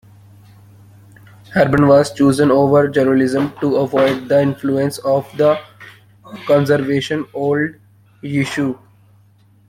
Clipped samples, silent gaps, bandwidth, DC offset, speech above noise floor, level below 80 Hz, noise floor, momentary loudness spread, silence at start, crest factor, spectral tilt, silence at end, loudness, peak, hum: under 0.1%; none; 15.5 kHz; under 0.1%; 36 dB; -52 dBFS; -51 dBFS; 10 LU; 1.5 s; 16 dB; -6.5 dB/octave; 0.95 s; -16 LUFS; -2 dBFS; none